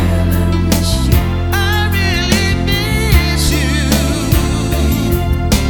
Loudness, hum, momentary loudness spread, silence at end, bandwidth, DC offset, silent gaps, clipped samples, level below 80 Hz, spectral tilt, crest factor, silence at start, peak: -14 LUFS; none; 3 LU; 0 s; over 20 kHz; under 0.1%; none; under 0.1%; -18 dBFS; -5 dB/octave; 12 dB; 0 s; 0 dBFS